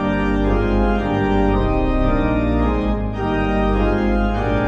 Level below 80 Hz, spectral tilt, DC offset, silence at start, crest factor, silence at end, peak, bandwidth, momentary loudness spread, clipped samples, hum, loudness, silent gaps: -22 dBFS; -8.5 dB/octave; under 0.1%; 0 s; 12 dB; 0 s; -4 dBFS; 6.6 kHz; 3 LU; under 0.1%; none; -19 LUFS; none